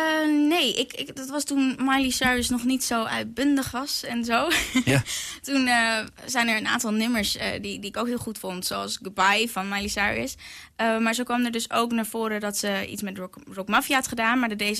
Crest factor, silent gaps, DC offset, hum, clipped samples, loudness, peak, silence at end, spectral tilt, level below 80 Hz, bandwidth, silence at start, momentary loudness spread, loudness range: 16 dB; none; under 0.1%; none; under 0.1%; -24 LUFS; -8 dBFS; 0 s; -3 dB/octave; -52 dBFS; 14 kHz; 0 s; 10 LU; 3 LU